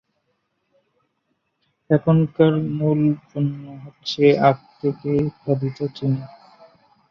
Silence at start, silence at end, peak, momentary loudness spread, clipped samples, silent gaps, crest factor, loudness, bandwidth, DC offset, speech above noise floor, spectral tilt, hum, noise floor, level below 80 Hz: 1.9 s; 0.85 s; -2 dBFS; 11 LU; under 0.1%; none; 20 dB; -20 LUFS; 6.8 kHz; under 0.1%; 52 dB; -8.5 dB/octave; none; -72 dBFS; -58 dBFS